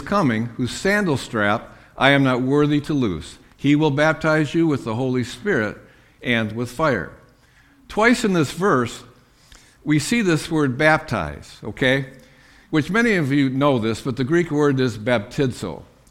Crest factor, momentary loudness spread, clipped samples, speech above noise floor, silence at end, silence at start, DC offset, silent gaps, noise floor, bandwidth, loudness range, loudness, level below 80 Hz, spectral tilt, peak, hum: 20 dB; 11 LU; under 0.1%; 34 dB; 0.25 s; 0 s; under 0.1%; none; -53 dBFS; 15.5 kHz; 3 LU; -20 LUFS; -48 dBFS; -6 dB/octave; 0 dBFS; none